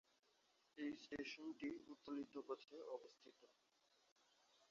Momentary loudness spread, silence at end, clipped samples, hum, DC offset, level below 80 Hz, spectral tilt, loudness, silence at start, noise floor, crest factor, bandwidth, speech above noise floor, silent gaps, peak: 15 LU; 0.05 s; under 0.1%; none; under 0.1%; -88 dBFS; -2.5 dB/octave; -53 LUFS; 0.75 s; -81 dBFS; 18 dB; 7.4 kHz; 28 dB; 4.12-4.16 s; -38 dBFS